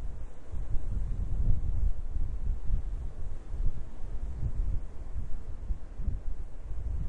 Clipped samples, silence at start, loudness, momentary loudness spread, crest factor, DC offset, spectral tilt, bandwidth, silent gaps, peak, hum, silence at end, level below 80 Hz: under 0.1%; 0 s; -38 LUFS; 11 LU; 16 dB; under 0.1%; -8.5 dB/octave; 2.2 kHz; none; -12 dBFS; none; 0 s; -32 dBFS